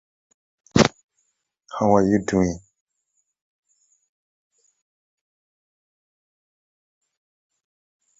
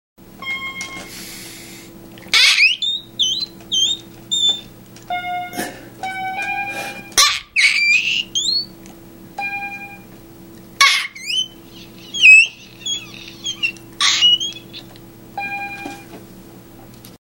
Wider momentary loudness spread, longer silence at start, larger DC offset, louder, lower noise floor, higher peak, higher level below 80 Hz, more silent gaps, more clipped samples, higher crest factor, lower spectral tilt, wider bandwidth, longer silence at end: second, 12 LU vs 21 LU; first, 0.75 s vs 0.35 s; neither; second, -20 LUFS vs -15 LUFS; first, -74 dBFS vs -40 dBFS; about the same, -2 dBFS vs 0 dBFS; about the same, -50 dBFS vs -52 dBFS; first, 1.03-1.09 s vs none; neither; first, 26 dB vs 20 dB; first, -5.5 dB/octave vs 0.5 dB/octave; second, 7.8 kHz vs 16.5 kHz; first, 5.6 s vs 0.1 s